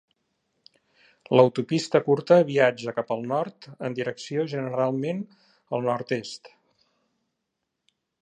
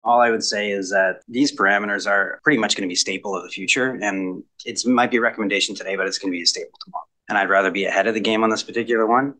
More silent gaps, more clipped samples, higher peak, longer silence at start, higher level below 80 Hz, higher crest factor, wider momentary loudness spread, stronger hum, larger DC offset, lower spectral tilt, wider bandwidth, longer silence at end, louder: neither; neither; about the same, -4 dBFS vs -2 dBFS; first, 1.3 s vs 0.05 s; about the same, -74 dBFS vs -72 dBFS; about the same, 22 dB vs 18 dB; first, 14 LU vs 10 LU; neither; neither; first, -6 dB/octave vs -2.5 dB/octave; about the same, 9.6 kHz vs 10 kHz; first, 1.75 s vs 0.05 s; second, -25 LUFS vs -20 LUFS